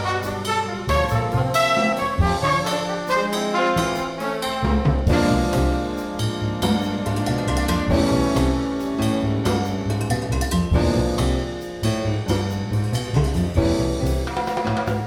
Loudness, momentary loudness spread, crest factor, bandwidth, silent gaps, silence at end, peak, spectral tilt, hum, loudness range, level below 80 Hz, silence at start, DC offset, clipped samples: -22 LUFS; 5 LU; 16 dB; 17.5 kHz; none; 0 s; -6 dBFS; -6 dB/octave; none; 2 LU; -30 dBFS; 0 s; under 0.1%; under 0.1%